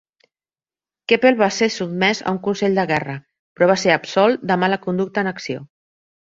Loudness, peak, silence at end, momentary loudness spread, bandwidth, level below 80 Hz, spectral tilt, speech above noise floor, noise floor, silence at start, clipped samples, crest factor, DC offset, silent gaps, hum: -18 LUFS; -2 dBFS; 0.65 s; 13 LU; 7.8 kHz; -62 dBFS; -5 dB/octave; over 72 dB; under -90 dBFS; 1.1 s; under 0.1%; 18 dB; under 0.1%; 3.39-3.56 s; none